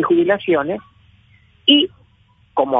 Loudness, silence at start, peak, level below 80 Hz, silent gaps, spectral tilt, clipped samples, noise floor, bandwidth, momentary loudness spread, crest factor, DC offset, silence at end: -16 LUFS; 0 s; 0 dBFS; -56 dBFS; none; -7.5 dB/octave; under 0.1%; -55 dBFS; 3.9 kHz; 12 LU; 18 dB; under 0.1%; 0 s